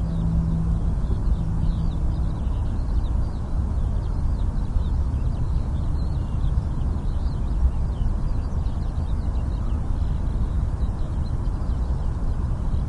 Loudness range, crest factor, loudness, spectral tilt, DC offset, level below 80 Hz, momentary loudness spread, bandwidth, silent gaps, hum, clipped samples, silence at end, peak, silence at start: 1 LU; 14 dB; -26 LUFS; -9 dB/octave; under 0.1%; -24 dBFS; 3 LU; 9.4 kHz; none; none; under 0.1%; 0 s; -10 dBFS; 0 s